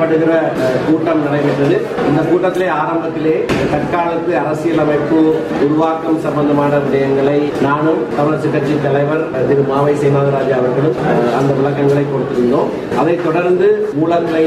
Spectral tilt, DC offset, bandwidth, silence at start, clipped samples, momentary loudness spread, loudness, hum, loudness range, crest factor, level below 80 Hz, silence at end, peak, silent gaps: -7.5 dB/octave; under 0.1%; 13 kHz; 0 s; under 0.1%; 3 LU; -14 LUFS; none; 1 LU; 10 dB; -46 dBFS; 0 s; -2 dBFS; none